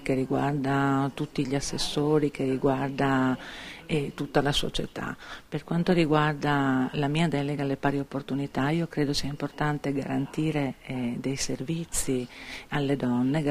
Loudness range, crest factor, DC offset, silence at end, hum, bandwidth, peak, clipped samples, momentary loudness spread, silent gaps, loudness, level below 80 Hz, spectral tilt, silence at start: 3 LU; 20 dB; under 0.1%; 0 s; none; 15.5 kHz; -8 dBFS; under 0.1%; 8 LU; none; -28 LUFS; -48 dBFS; -5.5 dB/octave; 0 s